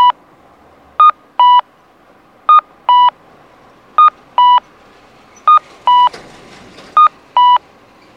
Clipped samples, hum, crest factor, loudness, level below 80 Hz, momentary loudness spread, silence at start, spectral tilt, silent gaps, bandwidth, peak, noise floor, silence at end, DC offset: under 0.1%; none; 12 dB; -11 LUFS; -60 dBFS; 6 LU; 0 s; -2 dB/octave; none; 6.8 kHz; 0 dBFS; -47 dBFS; 0.6 s; under 0.1%